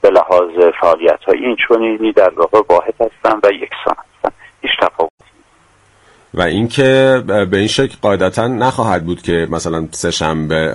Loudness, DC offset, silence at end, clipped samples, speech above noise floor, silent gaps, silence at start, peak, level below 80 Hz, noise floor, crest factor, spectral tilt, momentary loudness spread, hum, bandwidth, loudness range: -14 LUFS; under 0.1%; 0 s; under 0.1%; 38 dB; 5.10-5.18 s; 0.05 s; 0 dBFS; -42 dBFS; -51 dBFS; 14 dB; -5 dB/octave; 9 LU; none; 11.5 kHz; 6 LU